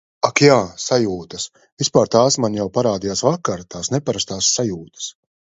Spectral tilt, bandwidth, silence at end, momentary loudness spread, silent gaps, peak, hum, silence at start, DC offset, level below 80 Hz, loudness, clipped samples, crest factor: -4 dB/octave; 8 kHz; 0.4 s; 15 LU; 1.72-1.77 s; 0 dBFS; none; 0.25 s; under 0.1%; -52 dBFS; -18 LUFS; under 0.1%; 18 dB